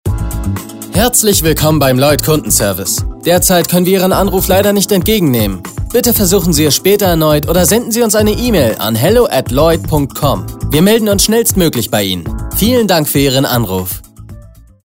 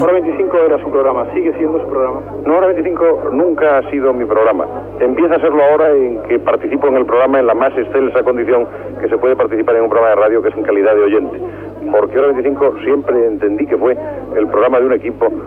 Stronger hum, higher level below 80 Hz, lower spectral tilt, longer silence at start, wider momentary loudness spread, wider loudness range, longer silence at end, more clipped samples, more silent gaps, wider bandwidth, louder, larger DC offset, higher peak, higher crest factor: second, none vs 50 Hz at -40 dBFS; first, -26 dBFS vs -46 dBFS; second, -4.5 dB/octave vs -8.5 dB/octave; about the same, 0.05 s vs 0 s; about the same, 8 LU vs 6 LU; about the same, 2 LU vs 2 LU; first, 0.4 s vs 0 s; neither; neither; first, 16.5 kHz vs 3.8 kHz; about the same, -11 LUFS vs -13 LUFS; neither; about the same, 0 dBFS vs -2 dBFS; about the same, 12 dB vs 10 dB